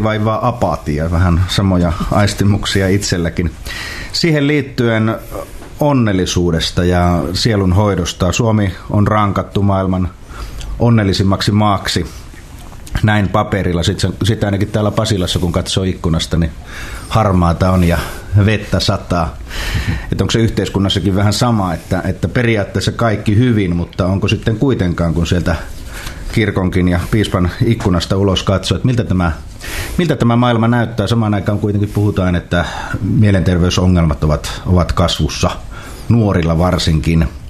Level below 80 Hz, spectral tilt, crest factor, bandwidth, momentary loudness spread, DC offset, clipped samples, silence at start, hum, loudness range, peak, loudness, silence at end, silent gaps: -28 dBFS; -6 dB/octave; 14 dB; 14 kHz; 8 LU; under 0.1%; under 0.1%; 0 s; none; 2 LU; 0 dBFS; -15 LUFS; 0 s; none